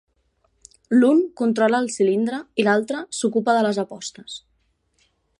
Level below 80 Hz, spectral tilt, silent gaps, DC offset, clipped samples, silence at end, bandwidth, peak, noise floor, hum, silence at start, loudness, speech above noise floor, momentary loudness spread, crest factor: -68 dBFS; -4.5 dB/octave; none; under 0.1%; under 0.1%; 1 s; 11.5 kHz; -4 dBFS; -67 dBFS; none; 0.9 s; -20 LUFS; 47 dB; 15 LU; 18 dB